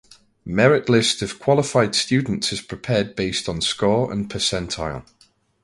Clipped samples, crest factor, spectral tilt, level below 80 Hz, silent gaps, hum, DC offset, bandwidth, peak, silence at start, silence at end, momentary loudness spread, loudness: under 0.1%; 20 dB; -4.5 dB/octave; -46 dBFS; none; none; under 0.1%; 11.5 kHz; -2 dBFS; 0.45 s; 0.6 s; 10 LU; -20 LUFS